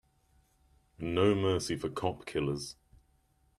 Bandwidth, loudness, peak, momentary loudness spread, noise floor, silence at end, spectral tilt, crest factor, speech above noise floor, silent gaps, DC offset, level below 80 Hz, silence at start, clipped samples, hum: 13.5 kHz; -32 LUFS; -14 dBFS; 12 LU; -70 dBFS; 0.85 s; -5.5 dB/octave; 20 dB; 39 dB; none; under 0.1%; -60 dBFS; 1 s; under 0.1%; none